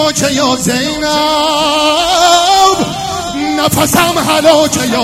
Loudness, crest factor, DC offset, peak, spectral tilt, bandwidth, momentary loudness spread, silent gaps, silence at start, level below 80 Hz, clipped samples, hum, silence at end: -10 LUFS; 10 dB; under 0.1%; 0 dBFS; -3 dB/octave; 17 kHz; 7 LU; none; 0 s; -38 dBFS; 0.3%; none; 0 s